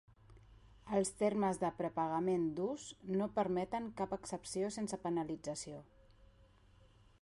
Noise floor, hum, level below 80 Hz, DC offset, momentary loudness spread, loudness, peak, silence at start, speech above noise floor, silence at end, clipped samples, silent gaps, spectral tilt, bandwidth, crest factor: -65 dBFS; none; -66 dBFS; under 0.1%; 8 LU; -38 LUFS; -22 dBFS; 0.3 s; 28 dB; 0.95 s; under 0.1%; none; -5.5 dB/octave; 11.5 kHz; 16 dB